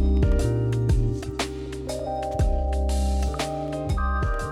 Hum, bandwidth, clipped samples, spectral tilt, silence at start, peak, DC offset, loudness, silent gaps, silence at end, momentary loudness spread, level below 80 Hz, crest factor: none; 13 kHz; under 0.1%; -6.5 dB/octave; 0 s; -12 dBFS; under 0.1%; -26 LUFS; none; 0 s; 7 LU; -26 dBFS; 12 dB